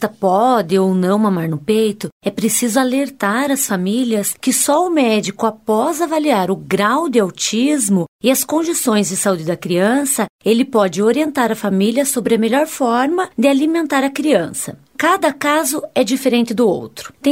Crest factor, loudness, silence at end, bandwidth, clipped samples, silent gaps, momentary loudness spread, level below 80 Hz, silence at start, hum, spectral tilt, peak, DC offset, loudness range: 14 dB; -16 LUFS; 0 s; 16.5 kHz; under 0.1%; 2.12-2.20 s, 8.08-8.19 s, 10.29-10.39 s; 4 LU; -60 dBFS; 0 s; none; -4 dB/octave; -2 dBFS; under 0.1%; 1 LU